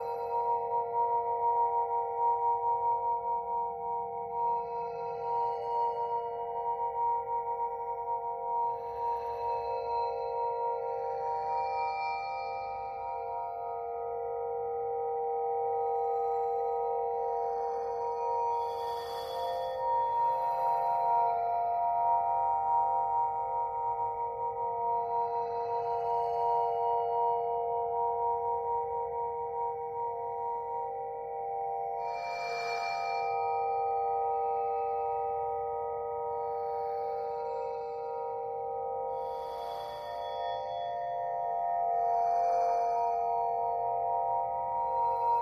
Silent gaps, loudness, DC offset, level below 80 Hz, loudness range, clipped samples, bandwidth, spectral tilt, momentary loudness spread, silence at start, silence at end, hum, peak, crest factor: none; -32 LUFS; under 0.1%; -66 dBFS; 5 LU; under 0.1%; 13 kHz; -4.5 dB/octave; 7 LU; 0 s; 0 s; none; -18 dBFS; 14 dB